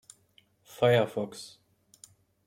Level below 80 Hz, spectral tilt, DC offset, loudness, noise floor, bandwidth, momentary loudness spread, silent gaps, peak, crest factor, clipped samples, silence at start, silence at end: -70 dBFS; -5.5 dB/octave; under 0.1%; -27 LUFS; -66 dBFS; 16 kHz; 21 LU; none; -12 dBFS; 20 dB; under 0.1%; 0.8 s; 1 s